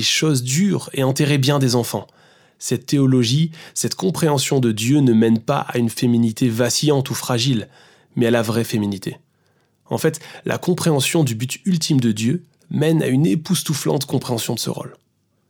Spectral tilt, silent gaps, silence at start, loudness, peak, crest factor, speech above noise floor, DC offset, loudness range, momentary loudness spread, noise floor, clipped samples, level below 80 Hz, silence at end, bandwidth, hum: -5 dB/octave; none; 0 s; -19 LUFS; -4 dBFS; 16 dB; 44 dB; under 0.1%; 4 LU; 9 LU; -62 dBFS; under 0.1%; -62 dBFS; 0.55 s; over 20 kHz; none